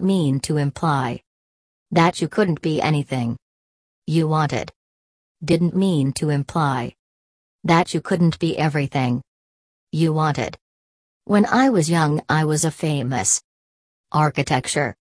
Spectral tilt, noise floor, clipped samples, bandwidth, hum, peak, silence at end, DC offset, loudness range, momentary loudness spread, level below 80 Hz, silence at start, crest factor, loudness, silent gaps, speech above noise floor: -5.5 dB/octave; under -90 dBFS; under 0.1%; 11 kHz; none; -2 dBFS; 0.15 s; under 0.1%; 3 LU; 10 LU; -54 dBFS; 0 s; 20 dB; -20 LUFS; 1.27-1.86 s, 3.42-4.02 s, 4.76-5.35 s, 6.99-7.59 s, 9.28-9.87 s, 10.61-11.21 s, 13.44-14.04 s; over 71 dB